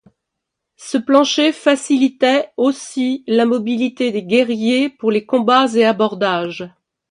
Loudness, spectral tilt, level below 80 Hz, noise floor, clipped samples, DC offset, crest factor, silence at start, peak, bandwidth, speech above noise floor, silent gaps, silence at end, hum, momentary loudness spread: -16 LUFS; -4 dB/octave; -66 dBFS; -79 dBFS; under 0.1%; under 0.1%; 16 dB; 0.8 s; 0 dBFS; 11 kHz; 63 dB; none; 0.4 s; none; 8 LU